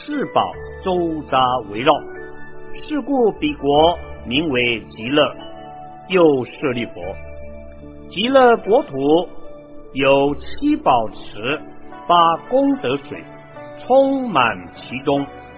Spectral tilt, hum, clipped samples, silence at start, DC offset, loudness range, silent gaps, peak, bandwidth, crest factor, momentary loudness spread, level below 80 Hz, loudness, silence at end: -9.5 dB/octave; none; under 0.1%; 0 s; under 0.1%; 3 LU; none; 0 dBFS; 4 kHz; 18 dB; 22 LU; -44 dBFS; -18 LUFS; 0 s